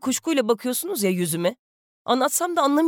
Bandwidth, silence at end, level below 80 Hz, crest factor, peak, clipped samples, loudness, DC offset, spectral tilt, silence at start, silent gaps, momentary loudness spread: 19.5 kHz; 0 s; -76 dBFS; 14 dB; -8 dBFS; under 0.1%; -23 LUFS; under 0.1%; -4 dB/octave; 0.05 s; 1.59-2.05 s; 5 LU